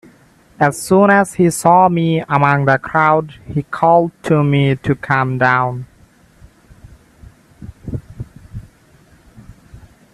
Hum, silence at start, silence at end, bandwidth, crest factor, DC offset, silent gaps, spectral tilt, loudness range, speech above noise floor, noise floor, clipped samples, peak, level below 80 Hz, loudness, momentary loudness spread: none; 0.6 s; 0.35 s; 13.5 kHz; 16 dB; under 0.1%; none; -6.5 dB/octave; 22 LU; 35 dB; -49 dBFS; under 0.1%; 0 dBFS; -46 dBFS; -14 LUFS; 20 LU